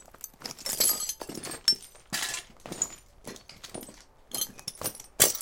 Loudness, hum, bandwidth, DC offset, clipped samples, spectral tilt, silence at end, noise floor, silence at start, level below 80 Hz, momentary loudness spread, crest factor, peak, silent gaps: -29 LUFS; none; 17 kHz; under 0.1%; under 0.1%; 0 dB/octave; 0 s; -51 dBFS; 0 s; -60 dBFS; 21 LU; 32 dB; -2 dBFS; none